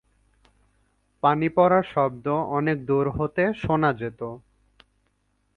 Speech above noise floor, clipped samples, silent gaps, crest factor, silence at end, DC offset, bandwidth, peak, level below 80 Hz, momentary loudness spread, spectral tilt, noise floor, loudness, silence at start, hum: 47 dB; under 0.1%; none; 20 dB; 1.2 s; under 0.1%; 6.2 kHz; -6 dBFS; -52 dBFS; 12 LU; -9 dB/octave; -70 dBFS; -23 LUFS; 1.25 s; 50 Hz at -55 dBFS